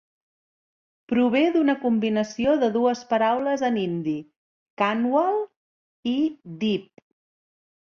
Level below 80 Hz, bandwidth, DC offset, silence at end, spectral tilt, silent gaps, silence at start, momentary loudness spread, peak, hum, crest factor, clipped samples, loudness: -64 dBFS; 7.2 kHz; under 0.1%; 1.1 s; -6 dB/octave; 4.36-4.77 s, 5.56-6.03 s; 1.1 s; 8 LU; -8 dBFS; none; 16 dB; under 0.1%; -23 LUFS